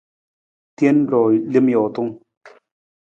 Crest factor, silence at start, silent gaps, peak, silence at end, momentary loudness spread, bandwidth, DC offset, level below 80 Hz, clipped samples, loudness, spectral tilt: 16 dB; 0.8 s; 2.37-2.41 s; -4 dBFS; 0.55 s; 9 LU; 7.6 kHz; under 0.1%; -68 dBFS; under 0.1%; -17 LUFS; -9 dB/octave